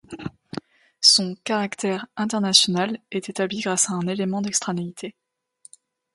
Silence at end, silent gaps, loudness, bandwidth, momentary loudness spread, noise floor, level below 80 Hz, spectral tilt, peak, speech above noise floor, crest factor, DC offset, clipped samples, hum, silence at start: 1.05 s; none; -21 LUFS; 11.5 kHz; 21 LU; -54 dBFS; -66 dBFS; -2.5 dB/octave; 0 dBFS; 31 dB; 24 dB; under 0.1%; under 0.1%; none; 0.1 s